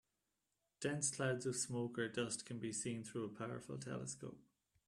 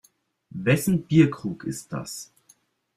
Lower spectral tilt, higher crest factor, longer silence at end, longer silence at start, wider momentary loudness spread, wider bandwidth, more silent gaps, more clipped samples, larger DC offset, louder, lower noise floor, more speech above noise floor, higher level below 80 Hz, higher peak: second, -4 dB/octave vs -6.5 dB/octave; about the same, 20 dB vs 20 dB; second, 0.45 s vs 0.75 s; first, 0.8 s vs 0.55 s; second, 9 LU vs 18 LU; second, 13.5 kHz vs 15.5 kHz; neither; neither; neither; second, -43 LUFS vs -24 LUFS; first, -88 dBFS vs -61 dBFS; first, 45 dB vs 38 dB; second, -78 dBFS vs -58 dBFS; second, -24 dBFS vs -4 dBFS